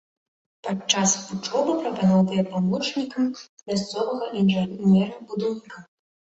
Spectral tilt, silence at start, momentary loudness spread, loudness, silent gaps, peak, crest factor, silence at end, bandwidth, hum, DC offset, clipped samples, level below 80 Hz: -5 dB/octave; 0.65 s; 10 LU; -23 LUFS; 3.49-3.57 s; -4 dBFS; 20 dB; 0.55 s; 8 kHz; none; under 0.1%; under 0.1%; -64 dBFS